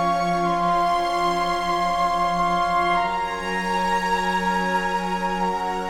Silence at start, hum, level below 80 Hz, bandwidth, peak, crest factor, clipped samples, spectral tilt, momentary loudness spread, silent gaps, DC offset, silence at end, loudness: 0 s; none; -42 dBFS; 16.5 kHz; -10 dBFS; 12 dB; under 0.1%; -4.5 dB/octave; 4 LU; none; under 0.1%; 0 s; -22 LUFS